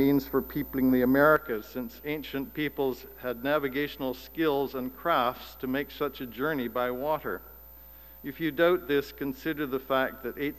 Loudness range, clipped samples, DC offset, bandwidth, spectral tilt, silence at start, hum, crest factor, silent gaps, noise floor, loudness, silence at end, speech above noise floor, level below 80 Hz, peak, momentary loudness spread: 4 LU; under 0.1%; 0.1%; 15.5 kHz; -6.5 dB/octave; 0 s; none; 20 dB; none; -50 dBFS; -29 LUFS; 0 s; 21 dB; -54 dBFS; -10 dBFS; 13 LU